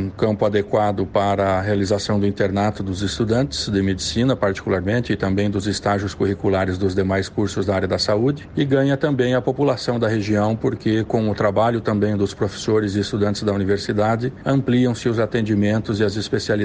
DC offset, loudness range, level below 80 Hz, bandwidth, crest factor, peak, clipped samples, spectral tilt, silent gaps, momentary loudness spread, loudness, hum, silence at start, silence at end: under 0.1%; 1 LU; -44 dBFS; 9.6 kHz; 14 dB; -4 dBFS; under 0.1%; -6 dB/octave; none; 3 LU; -20 LUFS; none; 0 s; 0 s